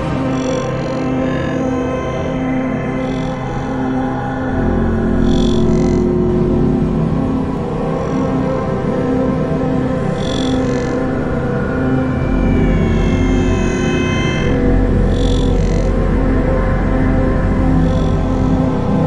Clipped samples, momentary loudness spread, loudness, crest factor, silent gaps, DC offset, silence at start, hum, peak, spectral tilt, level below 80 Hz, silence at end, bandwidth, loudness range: under 0.1%; 5 LU; -16 LUFS; 14 dB; none; under 0.1%; 0 s; none; -2 dBFS; -7.5 dB/octave; -22 dBFS; 0 s; 10 kHz; 3 LU